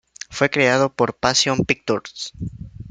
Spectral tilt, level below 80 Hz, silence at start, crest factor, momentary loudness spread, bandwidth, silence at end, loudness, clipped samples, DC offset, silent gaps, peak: -3.5 dB/octave; -48 dBFS; 0.3 s; 20 dB; 16 LU; 9.6 kHz; 0 s; -19 LUFS; under 0.1%; under 0.1%; none; -2 dBFS